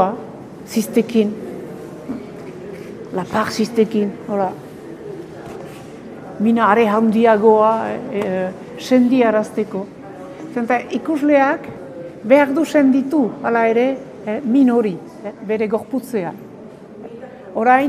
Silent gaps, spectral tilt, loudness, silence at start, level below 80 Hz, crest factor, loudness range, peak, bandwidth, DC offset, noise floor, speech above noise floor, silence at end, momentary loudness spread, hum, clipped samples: none; -6 dB/octave; -17 LUFS; 0 s; -60 dBFS; 18 dB; 7 LU; 0 dBFS; 15 kHz; under 0.1%; -37 dBFS; 21 dB; 0 s; 20 LU; none; under 0.1%